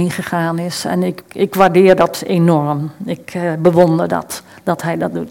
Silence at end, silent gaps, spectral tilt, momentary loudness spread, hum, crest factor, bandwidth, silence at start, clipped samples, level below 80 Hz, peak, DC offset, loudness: 0 s; none; -6.5 dB/octave; 11 LU; none; 14 dB; 17 kHz; 0 s; 0.3%; -54 dBFS; 0 dBFS; under 0.1%; -15 LUFS